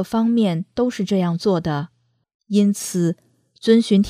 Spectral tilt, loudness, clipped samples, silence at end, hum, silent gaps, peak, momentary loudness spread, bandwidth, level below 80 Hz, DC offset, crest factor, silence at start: -6.5 dB/octave; -20 LUFS; under 0.1%; 0 s; none; 2.34-2.40 s; -2 dBFS; 8 LU; 15 kHz; -54 dBFS; under 0.1%; 18 dB; 0 s